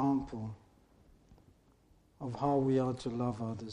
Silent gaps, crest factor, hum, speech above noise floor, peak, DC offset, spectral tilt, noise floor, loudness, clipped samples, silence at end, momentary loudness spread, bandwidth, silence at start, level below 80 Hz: none; 18 dB; none; 32 dB; -18 dBFS; under 0.1%; -8.5 dB/octave; -66 dBFS; -35 LUFS; under 0.1%; 0 s; 16 LU; 10 kHz; 0 s; -60 dBFS